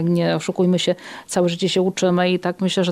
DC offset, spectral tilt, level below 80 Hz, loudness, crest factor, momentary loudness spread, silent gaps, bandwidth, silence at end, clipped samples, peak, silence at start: under 0.1%; -5.5 dB/octave; -62 dBFS; -20 LUFS; 14 dB; 4 LU; none; 13 kHz; 0 s; under 0.1%; -6 dBFS; 0 s